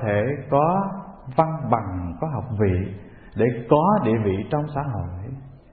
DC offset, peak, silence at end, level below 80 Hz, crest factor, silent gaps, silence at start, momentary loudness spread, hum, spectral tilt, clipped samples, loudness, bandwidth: under 0.1%; -2 dBFS; 0.15 s; -48 dBFS; 20 dB; none; 0 s; 15 LU; none; -13 dB/octave; under 0.1%; -23 LUFS; 4.5 kHz